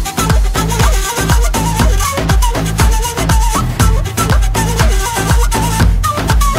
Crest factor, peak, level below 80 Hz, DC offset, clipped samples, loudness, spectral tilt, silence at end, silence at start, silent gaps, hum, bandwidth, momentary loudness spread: 12 dB; 0 dBFS; -14 dBFS; under 0.1%; under 0.1%; -13 LUFS; -4.5 dB/octave; 0 s; 0 s; none; none; 16.5 kHz; 2 LU